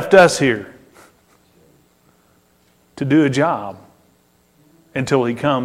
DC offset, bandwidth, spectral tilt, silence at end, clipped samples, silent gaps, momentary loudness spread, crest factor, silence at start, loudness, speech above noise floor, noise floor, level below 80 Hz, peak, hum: under 0.1%; 15.5 kHz; -5.5 dB/octave; 0 s; under 0.1%; none; 17 LU; 20 dB; 0 s; -17 LUFS; 42 dB; -57 dBFS; -56 dBFS; 0 dBFS; none